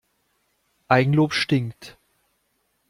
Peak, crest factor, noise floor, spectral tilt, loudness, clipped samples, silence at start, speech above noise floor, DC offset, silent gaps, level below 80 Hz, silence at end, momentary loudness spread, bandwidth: -2 dBFS; 22 dB; -71 dBFS; -6.5 dB/octave; -21 LUFS; under 0.1%; 0.9 s; 50 dB; under 0.1%; none; -60 dBFS; 1 s; 23 LU; 12 kHz